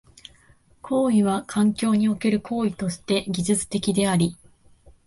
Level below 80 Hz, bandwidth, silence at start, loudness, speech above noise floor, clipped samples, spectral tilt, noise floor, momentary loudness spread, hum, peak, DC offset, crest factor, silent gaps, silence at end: -54 dBFS; 11.5 kHz; 0.85 s; -23 LUFS; 34 dB; under 0.1%; -5.5 dB/octave; -56 dBFS; 6 LU; none; -8 dBFS; under 0.1%; 16 dB; none; 0.7 s